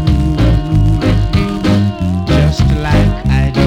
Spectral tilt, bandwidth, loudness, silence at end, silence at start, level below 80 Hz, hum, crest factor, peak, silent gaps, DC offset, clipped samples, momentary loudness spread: -7.5 dB/octave; 11.5 kHz; -13 LUFS; 0 s; 0 s; -16 dBFS; none; 8 dB; -2 dBFS; none; under 0.1%; under 0.1%; 2 LU